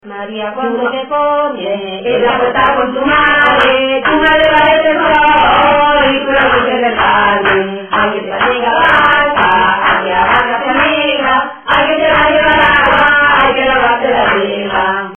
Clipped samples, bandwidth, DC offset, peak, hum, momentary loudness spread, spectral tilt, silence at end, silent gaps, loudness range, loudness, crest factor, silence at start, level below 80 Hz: under 0.1%; 6.8 kHz; under 0.1%; 0 dBFS; none; 7 LU; -6 dB/octave; 0 s; none; 2 LU; -10 LUFS; 10 dB; 0.05 s; -36 dBFS